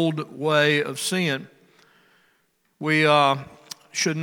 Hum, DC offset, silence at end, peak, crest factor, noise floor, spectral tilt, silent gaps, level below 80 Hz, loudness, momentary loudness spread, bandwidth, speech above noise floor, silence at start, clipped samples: none; under 0.1%; 0 s; -4 dBFS; 20 dB; -67 dBFS; -4 dB/octave; none; -72 dBFS; -22 LUFS; 14 LU; 18 kHz; 45 dB; 0 s; under 0.1%